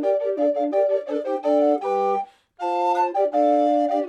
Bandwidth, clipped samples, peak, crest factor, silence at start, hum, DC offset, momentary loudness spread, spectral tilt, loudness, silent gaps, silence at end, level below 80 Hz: 8.4 kHz; under 0.1%; -8 dBFS; 12 dB; 0 s; none; under 0.1%; 7 LU; -6 dB/octave; -22 LUFS; none; 0 s; -78 dBFS